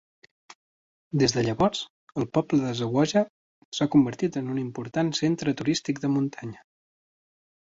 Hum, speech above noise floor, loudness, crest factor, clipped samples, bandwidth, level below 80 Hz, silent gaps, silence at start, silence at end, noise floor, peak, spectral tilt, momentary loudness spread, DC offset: none; over 65 dB; -26 LUFS; 18 dB; under 0.1%; 8 kHz; -58 dBFS; 1.90-2.07 s, 3.29-3.72 s; 1.15 s; 1.2 s; under -90 dBFS; -8 dBFS; -5.5 dB/octave; 10 LU; under 0.1%